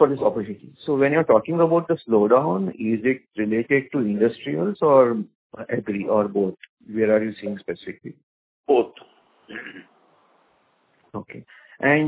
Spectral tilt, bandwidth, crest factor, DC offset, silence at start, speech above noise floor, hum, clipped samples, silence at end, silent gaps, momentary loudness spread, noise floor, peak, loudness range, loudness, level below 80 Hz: -11 dB/octave; 4 kHz; 20 dB; under 0.1%; 0 s; 42 dB; none; under 0.1%; 0 s; 5.35-5.50 s, 6.69-6.77 s, 8.23-8.64 s; 20 LU; -63 dBFS; -2 dBFS; 9 LU; -21 LUFS; -64 dBFS